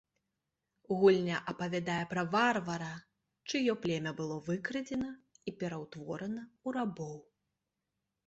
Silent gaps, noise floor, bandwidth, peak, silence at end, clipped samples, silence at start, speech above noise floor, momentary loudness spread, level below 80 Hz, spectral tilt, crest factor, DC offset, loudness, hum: none; -87 dBFS; 8 kHz; -14 dBFS; 1.05 s; under 0.1%; 0.9 s; 53 dB; 16 LU; -72 dBFS; -5.5 dB/octave; 20 dB; under 0.1%; -34 LUFS; none